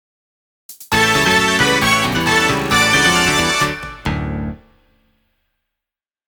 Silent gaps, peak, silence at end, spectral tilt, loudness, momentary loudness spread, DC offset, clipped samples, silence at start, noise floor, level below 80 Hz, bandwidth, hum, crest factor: none; 0 dBFS; 1.7 s; -3 dB/octave; -14 LUFS; 12 LU; under 0.1%; under 0.1%; 0.7 s; -87 dBFS; -36 dBFS; over 20 kHz; none; 16 dB